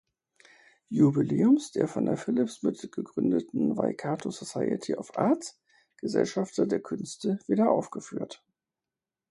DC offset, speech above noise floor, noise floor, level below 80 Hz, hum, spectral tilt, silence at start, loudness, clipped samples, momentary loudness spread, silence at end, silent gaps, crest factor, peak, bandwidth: under 0.1%; over 63 dB; under -90 dBFS; -70 dBFS; none; -6.5 dB/octave; 0.9 s; -28 LUFS; under 0.1%; 13 LU; 0.95 s; none; 18 dB; -10 dBFS; 11.5 kHz